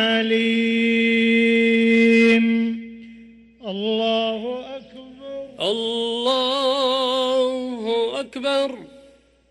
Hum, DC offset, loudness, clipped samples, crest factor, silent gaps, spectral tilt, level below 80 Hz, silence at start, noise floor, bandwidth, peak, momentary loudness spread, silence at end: none; under 0.1%; -19 LUFS; under 0.1%; 12 dB; none; -4.5 dB/octave; -62 dBFS; 0 s; -52 dBFS; 11.5 kHz; -8 dBFS; 18 LU; 0.65 s